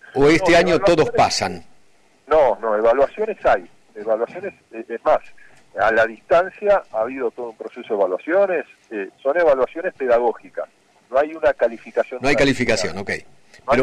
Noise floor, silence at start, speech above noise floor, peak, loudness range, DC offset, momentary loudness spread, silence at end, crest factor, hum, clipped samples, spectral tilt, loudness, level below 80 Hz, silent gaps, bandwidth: -56 dBFS; 0.05 s; 37 dB; -6 dBFS; 3 LU; under 0.1%; 16 LU; 0 s; 12 dB; none; under 0.1%; -4.5 dB/octave; -19 LUFS; -44 dBFS; none; 11.5 kHz